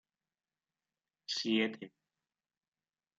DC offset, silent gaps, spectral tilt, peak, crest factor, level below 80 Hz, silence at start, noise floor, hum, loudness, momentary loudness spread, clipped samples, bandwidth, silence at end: under 0.1%; none; -3.5 dB/octave; -20 dBFS; 22 dB; under -90 dBFS; 1.3 s; under -90 dBFS; none; -35 LUFS; 19 LU; under 0.1%; 7.8 kHz; 1.3 s